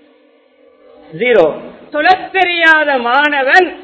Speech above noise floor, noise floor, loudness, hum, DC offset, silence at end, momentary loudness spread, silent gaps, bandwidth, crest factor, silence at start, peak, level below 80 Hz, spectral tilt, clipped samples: 38 dB; -49 dBFS; -11 LUFS; none; under 0.1%; 0 s; 8 LU; none; 8 kHz; 14 dB; 1.1 s; 0 dBFS; -54 dBFS; -4 dB/octave; 0.4%